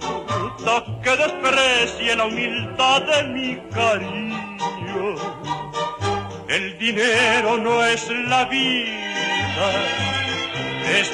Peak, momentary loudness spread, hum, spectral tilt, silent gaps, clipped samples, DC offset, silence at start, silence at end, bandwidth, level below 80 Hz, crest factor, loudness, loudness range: -6 dBFS; 10 LU; none; -3 dB/octave; none; under 0.1%; under 0.1%; 0 s; 0 s; 11.5 kHz; -52 dBFS; 16 dB; -20 LUFS; 5 LU